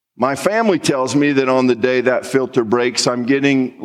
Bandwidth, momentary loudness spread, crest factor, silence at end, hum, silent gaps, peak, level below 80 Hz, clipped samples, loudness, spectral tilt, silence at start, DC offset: 13.5 kHz; 3 LU; 14 dB; 0 s; none; none; -2 dBFS; -64 dBFS; under 0.1%; -16 LUFS; -4.5 dB/octave; 0.2 s; under 0.1%